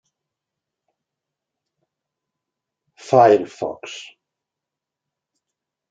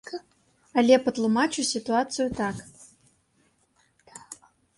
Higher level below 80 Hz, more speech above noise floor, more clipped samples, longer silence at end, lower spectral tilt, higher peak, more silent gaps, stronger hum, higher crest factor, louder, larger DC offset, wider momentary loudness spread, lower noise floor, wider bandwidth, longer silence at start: second, -72 dBFS vs -60 dBFS; first, 68 dB vs 43 dB; neither; first, 1.9 s vs 0.45 s; first, -6 dB/octave vs -4 dB/octave; first, -2 dBFS vs -6 dBFS; neither; neither; about the same, 22 dB vs 22 dB; first, -17 LUFS vs -24 LUFS; neither; about the same, 21 LU vs 23 LU; first, -85 dBFS vs -67 dBFS; second, 7.8 kHz vs 11.5 kHz; first, 3.05 s vs 0.05 s